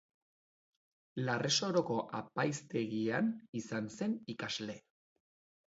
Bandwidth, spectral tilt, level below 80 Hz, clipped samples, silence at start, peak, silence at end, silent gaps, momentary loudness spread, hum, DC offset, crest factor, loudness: 7.6 kHz; -4 dB/octave; -78 dBFS; under 0.1%; 1.15 s; -18 dBFS; 0.9 s; 3.49-3.53 s; 10 LU; none; under 0.1%; 20 dB; -36 LUFS